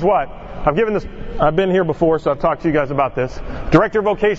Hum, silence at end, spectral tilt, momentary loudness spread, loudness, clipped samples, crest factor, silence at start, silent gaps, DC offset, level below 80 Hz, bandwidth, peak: none; 0 s; -8 dB/octave; 9 LU; -17 LUFS; under 0.1%; 16 dB; 0 s; none; under 0.1%; -32 dBFS; 7.8 kHz; 0 dBFS